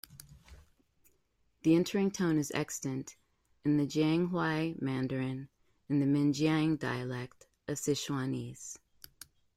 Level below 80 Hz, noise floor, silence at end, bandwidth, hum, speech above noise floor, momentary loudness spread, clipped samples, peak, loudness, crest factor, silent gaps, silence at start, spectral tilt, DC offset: -66 dBFS; -74 dBFS; 0.8 s; 16 kHz; none; 42 dB; 18 LU; under 0.1%; -16 dBFS; -32 LUFS; 18 dB; none; 0.1 s; -5.5 dB/octave; under 0.1%